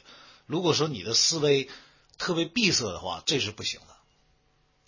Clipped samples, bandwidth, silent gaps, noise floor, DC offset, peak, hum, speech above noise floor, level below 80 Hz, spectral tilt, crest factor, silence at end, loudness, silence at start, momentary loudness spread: under 0.1%; 7.4 kHz; none; -67 dBFS; under 0.1%; -10 dBFS; none; 40 dB; -60 dBFS; -3 dB/octave; 20 dB; 1.1 s; -26 LUFS; 0.1 s; 12 LU